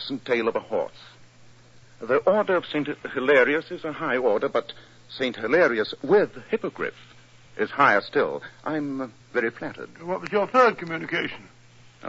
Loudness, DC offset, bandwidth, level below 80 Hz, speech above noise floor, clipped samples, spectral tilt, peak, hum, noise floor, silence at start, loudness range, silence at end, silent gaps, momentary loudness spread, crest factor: -24 LUFS; under 0.1%; 7.8 kHz; -66 dBFS; 28 dB; under 0.1%; -6 dB/octave; -6 dBFS; none; -52 dBFS; 0 s; 3 LU; 0 s; none; 14 LU; 20 dB